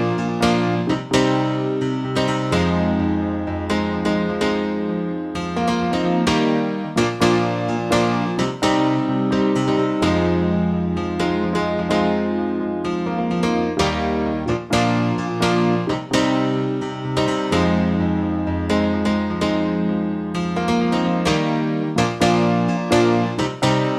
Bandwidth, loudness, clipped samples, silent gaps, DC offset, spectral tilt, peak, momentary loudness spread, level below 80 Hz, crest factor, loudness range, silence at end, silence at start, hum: 13 kHz; -20 LUFS; under 0.1%; none; under 0.1%; -6 dB/octave; -4 dBFS; 5 LU; -42 dBFS; 16 dB; 2 LU; 0 s; 0 s; none